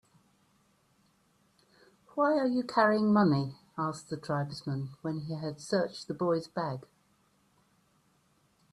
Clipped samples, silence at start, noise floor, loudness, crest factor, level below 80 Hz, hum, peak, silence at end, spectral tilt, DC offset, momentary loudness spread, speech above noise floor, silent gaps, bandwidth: under 0.1%; 2.15 s; -70 dBFS; -31 LUFS; 22 dB; -72 dBFS; none; -12 dBFS; 1.9 s; -7 dB/octave; under 0.1%; 12 LU; 40 dB; none; 11.5 kHz